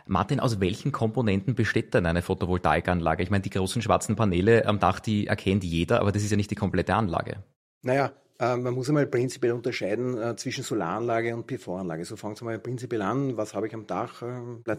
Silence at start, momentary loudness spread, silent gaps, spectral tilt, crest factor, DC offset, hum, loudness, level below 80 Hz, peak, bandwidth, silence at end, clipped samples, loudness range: 0.1 s; 10 LU; 7.56-7.81 s; -6 dB/octave; 20 dB; under 0.1%; none; -27 LUFS; -50 dBFS; -6 dBFS; 15 kHz; 0 s; under 0.1%; 6 LU